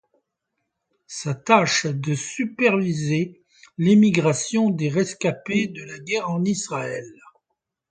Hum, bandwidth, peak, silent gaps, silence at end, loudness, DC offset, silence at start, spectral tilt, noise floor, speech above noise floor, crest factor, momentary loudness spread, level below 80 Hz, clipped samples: none; 9.4 kHz; 0 dBFS; none; 0.8 s; -22 LUFS; under 0.1%; 1.1 s; -5 dB/octave; -79 dBFS; 58 dB; 22 dB; 14 LU; -64 dBFS; under 0.1%